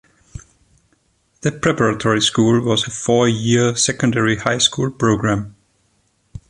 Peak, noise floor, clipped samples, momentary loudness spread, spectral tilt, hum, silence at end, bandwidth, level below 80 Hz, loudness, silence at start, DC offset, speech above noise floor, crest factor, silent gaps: 0 dBFS; -62 dBFS; under 0.1%; 6 LU; -4 dB/octave; none; 0.1 s; 11.5 kHz; -46 dBFS; -17 LUFS; 0.35 s; under 0.1%; 46 dB; 18 dB; none